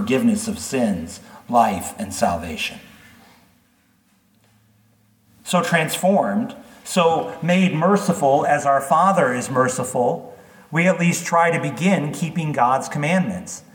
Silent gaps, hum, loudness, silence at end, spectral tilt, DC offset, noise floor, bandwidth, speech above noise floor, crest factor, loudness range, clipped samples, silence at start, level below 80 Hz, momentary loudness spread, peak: none; none; -20 LUFS; 0.15 s; -5 dB/octave; under 0.1%; -60 dBFS; 19 kHz; 41 dB; 18 dB; 9 LU; under 0.1%; 0 s; -56 dBFS; 10 LU; -2 dBFS